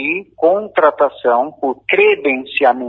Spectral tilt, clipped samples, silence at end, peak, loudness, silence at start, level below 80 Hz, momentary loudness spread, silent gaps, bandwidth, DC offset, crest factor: -6.5 dB/octave; under 0.1%; 0 s; 0 dBFS; -15 LUFS; 0 s; -62 dBFS; 7 LU; none; 4.4 kHz; under 0.1%; 14 dB